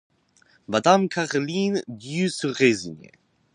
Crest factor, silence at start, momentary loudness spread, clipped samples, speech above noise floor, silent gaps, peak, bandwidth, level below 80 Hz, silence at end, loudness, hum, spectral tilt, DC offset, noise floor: 22 dB; 0.7 s; 10 LU; under 0.1%; 38 dB; none; -4 dBFS; 10.5 kHz; -66 dBFS; 0.5 s; -23 LUFS; none; -5 dB/octave; under 0.1%; -61 dBFS